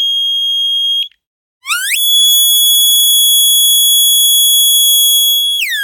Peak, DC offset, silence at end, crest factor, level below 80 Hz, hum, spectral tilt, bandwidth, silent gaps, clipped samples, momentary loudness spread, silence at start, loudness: 0 dBFS; under 0.1%; 0 s; 10 dB; -76 dBFS; none; 9.5 dB/octave; 19 kHz; 1.27-1.61 s; under 0.1%; 7 LU; 0 s; -7 LUFS